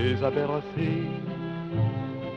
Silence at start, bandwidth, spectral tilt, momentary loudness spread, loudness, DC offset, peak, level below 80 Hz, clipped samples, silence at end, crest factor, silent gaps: 0 s; 6.2 kHz; -9 dB/octave; 7 LU; -29 LUFS; under 0.1%; -12 dBFS; -54 dBFS; under 0.1%; 0 s; 16 dB; none